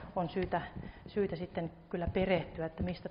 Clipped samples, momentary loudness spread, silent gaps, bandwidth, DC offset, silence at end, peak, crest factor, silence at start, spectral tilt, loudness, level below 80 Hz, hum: under 0.1%; 8 LU; none; 5.4 kHz; under 0.1%; 0 s; -18 dBFS; 18 dB; 0 s; -5.5 dB/octave; -36 LUFS; -52 dBFS; none